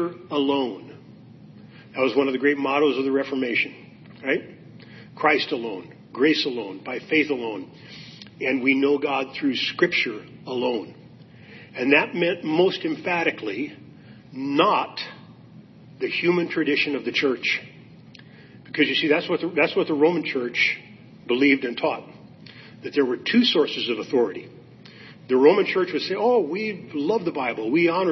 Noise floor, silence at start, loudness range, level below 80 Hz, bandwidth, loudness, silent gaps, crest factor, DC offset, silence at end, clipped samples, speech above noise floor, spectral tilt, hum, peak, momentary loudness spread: -47 dBFS; 0 s; 3 LU; -72 dBFS; 6.2 kHz; -23 LUFS; none; 20 dB; under 0.1%; 0 s; under 0.1%; 24 dB; -5.5 dB/octave; none; -4 dBFS; 15 LU